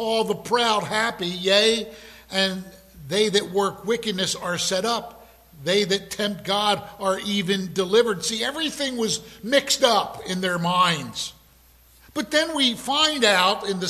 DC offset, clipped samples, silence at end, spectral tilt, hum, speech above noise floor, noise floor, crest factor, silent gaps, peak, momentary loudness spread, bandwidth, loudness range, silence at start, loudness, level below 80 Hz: under 0.1%; under 0.1%; 0 s; -3 dB/octave; none; 31 dB; -54 dBFS; 20 dB; none; -4 dBFS; 10 LU; 15 kHz; 2 LU; 0 s; -22 LUFS; -56 dBFS